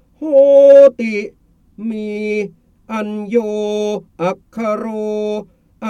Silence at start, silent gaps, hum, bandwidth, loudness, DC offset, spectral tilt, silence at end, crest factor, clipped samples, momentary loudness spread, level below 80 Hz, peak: 0.2 s; none; none; 7.2 kHz; -14 LUFS; under 0.1%; -6.5 dB/octave; 0 s; 14 dB; under 0.1%; 18 LU; -56 dBFS; 0 dBFS